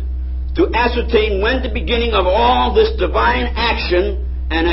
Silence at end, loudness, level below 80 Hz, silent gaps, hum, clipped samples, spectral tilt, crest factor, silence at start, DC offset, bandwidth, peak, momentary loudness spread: 0 s; -16 LUFS; -22 dBFS; none; none; under 0.1%; -10 dB/octave; 14 dB; 0 s; under 0.1%; 5.8 kHz; 0 dBFS; 8 LU